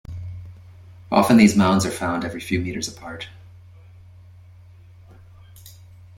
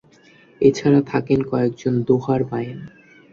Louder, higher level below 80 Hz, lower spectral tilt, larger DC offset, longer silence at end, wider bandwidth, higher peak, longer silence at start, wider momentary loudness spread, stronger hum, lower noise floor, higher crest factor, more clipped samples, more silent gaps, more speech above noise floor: about the same, -19 LUFS vs -19 LUFS; about the same, -52 dBFS vs -54 dBFS; second, -5.5 dB/octave vs -8 dB/octave; neither; about the same, 0.45 s vs 0.45 s; first, 16.5 kHz vs 7.4 kHz; about the same, -2 dBFS vs -2 dBFS; second, 0.1 s vs 0.6 s; first, 23 LU vs 10 LU; neither; second, -46 dBFS vs -51 dBFS; about the same, 20 dB vs 18 dB; neither; neither; second, 27 dB vs 32 dB